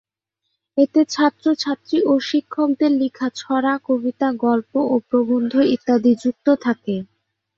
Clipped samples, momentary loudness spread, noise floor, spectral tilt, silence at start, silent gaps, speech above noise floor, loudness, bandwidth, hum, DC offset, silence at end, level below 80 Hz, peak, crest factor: under 0.1%; 5 LU; -77 dBFS; -5.5 dB/octave; 0.75 s; none; 59 dB; -19 LUFS; 7.6 kHz; none; under 0.1%; 0.55 s; -64 dBFS; -4 dBFS; 16 dB